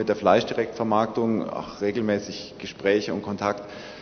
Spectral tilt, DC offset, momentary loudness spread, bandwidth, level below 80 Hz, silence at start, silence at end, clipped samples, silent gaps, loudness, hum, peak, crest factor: -5.5 dB/octave; under 0.1%; 14 LU; 6.6 kHz; -60 dBFS; 0 s; 0 s; under 0.1%; none; -25 LUFS; none; -4 dBFS; 20 dB